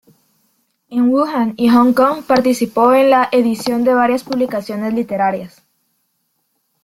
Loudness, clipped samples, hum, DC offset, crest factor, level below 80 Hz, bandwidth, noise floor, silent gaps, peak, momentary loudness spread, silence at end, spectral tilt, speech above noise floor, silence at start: -14 LUFS; under 0.1%; none; under 0.1%; 14 dB; -56 dBFS; 15.5 kHz; -67 dBFS; none; -2 dBFS; 9 LU; 1.35 s; -5.5 dB/octave; 53 dB; 0.9 s